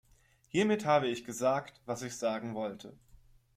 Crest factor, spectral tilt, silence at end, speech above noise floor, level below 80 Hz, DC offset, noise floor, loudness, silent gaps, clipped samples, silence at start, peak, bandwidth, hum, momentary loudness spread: 18 dB; -5 dB/octave; 0.65 s; 34 dB; -68 dBFS; under 0.1%; -66 dBFS; -33 LUFS; none; under 0.1%; 0.55 s; -16 dBFS; 15.5 kHz; none; 12 LU